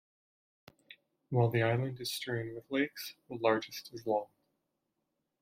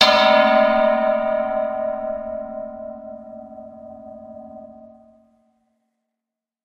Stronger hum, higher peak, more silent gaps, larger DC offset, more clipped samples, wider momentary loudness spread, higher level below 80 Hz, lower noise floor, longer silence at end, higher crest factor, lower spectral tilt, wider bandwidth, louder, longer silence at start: neither; second, -14 dBFS vs 0 dBFS; neither; neither; neither; second, 13 LU vs 25 LU; second, -74 dBFS vs -54 dBFS; about the same, -84 dBFS vs -86 dBFS; second, 1.15 s vs 1.8 s; about the same, 20 dB vs 22 dB; first, -6 dB/octave vs -3.5 dB/octave; about the same, 16 kHz vs 15.5 kHz; second, -34 LUFS vs -18 LUFS; first, 0.9 s vs 0 s